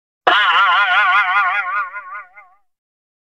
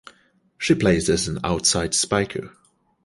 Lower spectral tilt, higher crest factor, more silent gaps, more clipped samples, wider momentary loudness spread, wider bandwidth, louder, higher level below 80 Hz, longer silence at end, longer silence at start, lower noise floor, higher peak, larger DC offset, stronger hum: second, -1 dB/octave vs -3.5 dB/octave; about the same, 18 dB vs 18 dB; neither; neither; first, 18 LU vs 10 LU; second, 8.8 kHz vs 11.5 kHz; first, -14 LUFS vs -21 LUFS; second, -66 dBFS vs -42 dBFS; first, 0.95 s vs 0.55 s; second, 0.25 s vs 0.6 s; second, -47 dBFS vs -60 dBFS; first, 0 dBFS vs -4 dBFS; first, 0.1% vs under 0.1%; neither